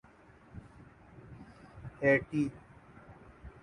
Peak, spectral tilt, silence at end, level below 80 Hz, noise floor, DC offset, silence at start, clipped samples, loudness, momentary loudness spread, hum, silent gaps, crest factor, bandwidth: -14 dBFS; -8 dB/octave; 0.15 s; -60 dBFS; -59 dBFS; under 0.1%; 0.55 s; under 0.1%; -31 LUFS; 27 LU; none; none; 22 dB; 10.5 kHz